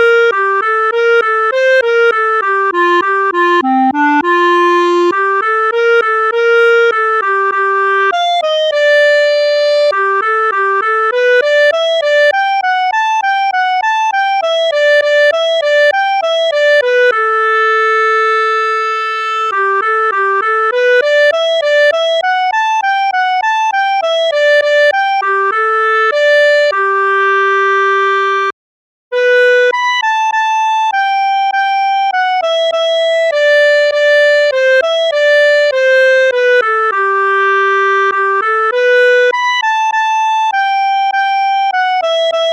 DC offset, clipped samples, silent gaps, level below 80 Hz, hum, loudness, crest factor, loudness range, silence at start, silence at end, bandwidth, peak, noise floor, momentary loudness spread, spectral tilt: under 0.1%; under 0.1%; 28.53-29.11 s; -70 dBFS; none; -11 LUFS; 10 dB; 2 LU; 0 s; 0 s; 9.4 kHz; -2 dBFS; under -90 dBFS; 4 LU; -1 dB/octave